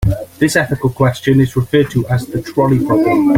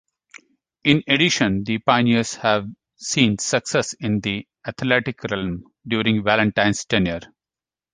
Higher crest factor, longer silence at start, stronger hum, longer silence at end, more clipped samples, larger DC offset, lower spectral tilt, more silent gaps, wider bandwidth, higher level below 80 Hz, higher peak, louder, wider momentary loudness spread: second, 12 dB vs 20 dB; second, 0 s vs 0.85 s; neither; second, 0 s vs 0.65 s; neither; neither; first, -7 dB/octave vs -4 dB/octave; neither; first, 16.5 kHz vs 10 kHz; first, -32 dBFS vs -50 dBFS; about the same, 0 dBFS vs -2 dBFS; first, -14 LUFS vs -20 LUFS; second, 6 LU vs 11 LU